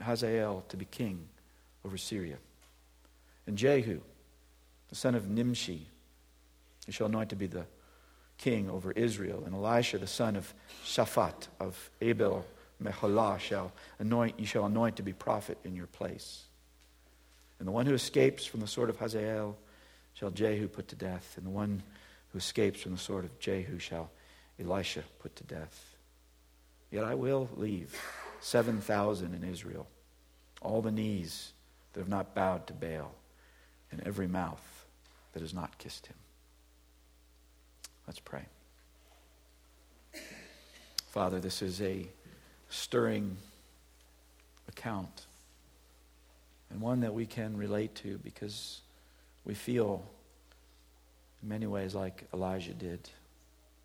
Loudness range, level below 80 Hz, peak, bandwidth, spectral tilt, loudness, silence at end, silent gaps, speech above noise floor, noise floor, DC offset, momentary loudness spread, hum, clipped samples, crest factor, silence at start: 9 LU; -62 dBFS; -12 dBFS; 19 kHz; -5.5 dB/octave; -35 LUFS; 0.65 s; none; 29 dB; -64 dBFS; under 0.1%; 19 LU; none; under 0.1%; 24 dB; 0 s